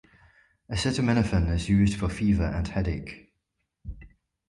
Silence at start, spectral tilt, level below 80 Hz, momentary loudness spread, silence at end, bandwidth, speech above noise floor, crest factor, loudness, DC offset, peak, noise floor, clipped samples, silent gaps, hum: 0.7 s; -6.5 dB/octave; -36 dBFS; 21 LU; 0.45 s; 11.5 kHz; 54 dB; 16 dB; -26 LUFS; under 0.1%; -10 dBFS; -79 dBFS; under 0.1%; none; none